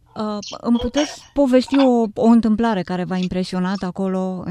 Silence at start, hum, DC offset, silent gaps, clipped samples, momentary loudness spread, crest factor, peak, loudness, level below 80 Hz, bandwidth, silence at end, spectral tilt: 0.15 s; none; under 0.1%; none; under 0.1%; 9 LU; 16 dB; -2 dBFS; -19 LUFS; -44 dBFS; 11 kHz; 0 s; -6.5 dB/octave